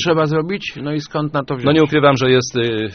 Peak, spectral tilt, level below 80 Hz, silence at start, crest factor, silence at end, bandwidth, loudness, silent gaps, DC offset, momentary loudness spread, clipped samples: 0 dBFS; -4.5 dB/octave; -50 dBFS; 0 s; 16 dB; 0 s; 6.6 kHz; -16 LUFS; none; under 0.1%; 10 LU; under 0.1%